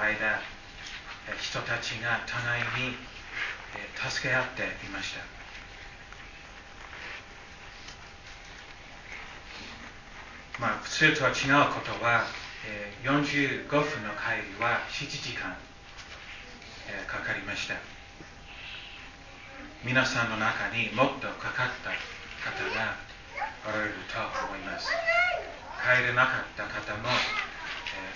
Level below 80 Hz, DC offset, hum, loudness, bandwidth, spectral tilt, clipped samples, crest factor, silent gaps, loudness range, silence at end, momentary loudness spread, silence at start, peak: -54 dBFS; under 0.1%; none; -29 LUFS; 7.4 kHz; -4 dB/octave; under 0.1%; 24 dB; none; 16 LU; 0 s; 20 LU; 0 s; -8 dBFS